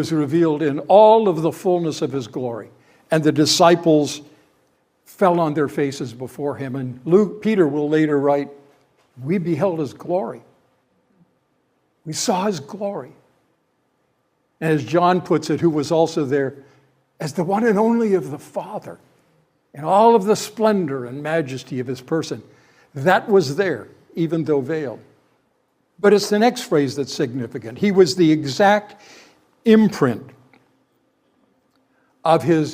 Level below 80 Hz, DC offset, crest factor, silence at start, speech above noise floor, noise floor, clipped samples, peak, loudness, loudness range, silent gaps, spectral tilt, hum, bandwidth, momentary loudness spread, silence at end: -68 dBFS; under 0.1%; 20 dB; 0 s; 49 dB; -67 dBFS; under 0.1%; 0 dBFS; -19 LUFS; 8 LU; none; -5.5 dB/octave; none; 16 kHz; 15 LU; 0 s